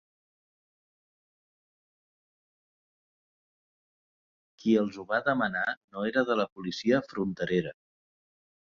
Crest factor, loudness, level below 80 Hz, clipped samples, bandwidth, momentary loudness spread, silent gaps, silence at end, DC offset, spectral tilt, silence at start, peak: 22 dB; -29 LUFS; -68 dBFS; under 0.1%; 7.2 kHz; 7 LU; 5.77-5.88 s, 6.52-6.56 s; 0.95 s; under 0.1%; -6 dB/octave; 4.6 s; -10 dBFS